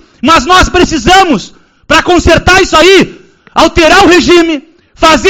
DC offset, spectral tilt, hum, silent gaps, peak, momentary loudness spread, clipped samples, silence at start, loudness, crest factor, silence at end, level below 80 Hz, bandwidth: under 0.1%; -3.5 dB/octave; none; none; 0 dBFS; 8 LU; 7%; 0.25 s; -5 LUFS; 6 dB; 0 s; -22 dBFS; 18.5 kHz